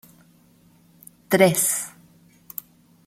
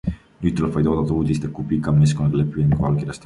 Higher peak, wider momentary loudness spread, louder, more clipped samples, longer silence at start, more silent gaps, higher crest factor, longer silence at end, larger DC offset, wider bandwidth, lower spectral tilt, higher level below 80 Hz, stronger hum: first, -2 dBFS vs -6 dBFS; first, 20 LU vs 7 LU; about the same, -19 LUFS vs -20 LUFS; neither; first, 1.3 s vs 0.05 s; neither; first, 24 dB vs 14 dB; first, 1.2 s vs 0.05 s; neither; first, 16.5 kHz vs 11 kHz; second, -3.5 dB/octave vs -8 dB/octave; second, -68 dBFS vs -36 dBFS; neither